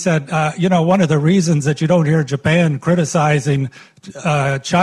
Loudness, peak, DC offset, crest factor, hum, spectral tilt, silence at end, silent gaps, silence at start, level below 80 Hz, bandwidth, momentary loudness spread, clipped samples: -16 LUFS; -4 dBFS; under 0.1%; 12 dB; none; -6 dB/octave; 0 s; none; 0 s; -50 dBFS; 11.5 kHz; 5 LU; under 0.1%